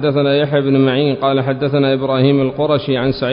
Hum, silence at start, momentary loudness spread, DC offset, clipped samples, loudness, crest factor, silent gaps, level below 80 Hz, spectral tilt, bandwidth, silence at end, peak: none; 0 s; 3 LU; under 0.1%; under 0.1%; -15 LUFS; 14 dB; none; -46 dBFS; -12.5 dB/octave; 5.4 kHz; 0 s; -2 dBFS